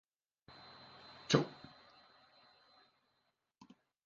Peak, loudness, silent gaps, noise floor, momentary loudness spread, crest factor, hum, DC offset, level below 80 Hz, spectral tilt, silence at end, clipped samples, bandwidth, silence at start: -12 dBFS; -35 LUFS; none; -83 dBFS; 27 LU; 32 dB; none; under 0.1%; -76 dBFS; -4.5 dB/octave; 2.55 s; under 0.1%; 7.6 kHz; 1.3 s